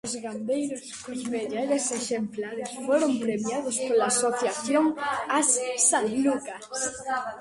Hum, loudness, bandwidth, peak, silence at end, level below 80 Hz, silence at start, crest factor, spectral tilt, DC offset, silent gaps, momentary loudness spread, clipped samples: none; -26 LUFS; 11.5 kHz; -8 dBFS; 0 s; -68 dBFS; 0.05 s; 18 dB; -2.5 dB/octave; under 0.1%; none; 11 LU; under 0.1%